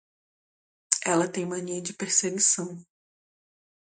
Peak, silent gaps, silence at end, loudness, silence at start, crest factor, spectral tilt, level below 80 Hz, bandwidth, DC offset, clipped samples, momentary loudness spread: 0 dBFS; none; 1.15 s; -25 LUFS; 0.9 s; 30 dB; -2.5 dB/octave; -76 dBFS; 9.8 kHz; under 0.1%; under 0.1%; 11 LU